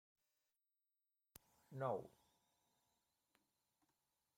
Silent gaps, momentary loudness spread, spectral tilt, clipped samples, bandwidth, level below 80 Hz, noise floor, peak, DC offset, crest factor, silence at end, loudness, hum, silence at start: none; 22 LU; -7 dB/octave; under 0.1%; 16 kHz; -90 dBFS; under -90 dBFS; -32 dBFS; under 0.1%; 24 dB; 2.3 s; -48 LUFS; none; 1.7 s